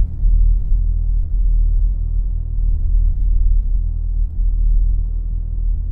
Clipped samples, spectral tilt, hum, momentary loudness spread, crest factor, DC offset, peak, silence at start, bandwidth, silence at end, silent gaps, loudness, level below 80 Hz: under 0.1%; -12.5 dB/octave; none; 5 LU; 10 dB; under 0.1%; -6 dBFS; 0 s; 0.7 kHz; 0 s; none; -21 LUFS; -16 dBFS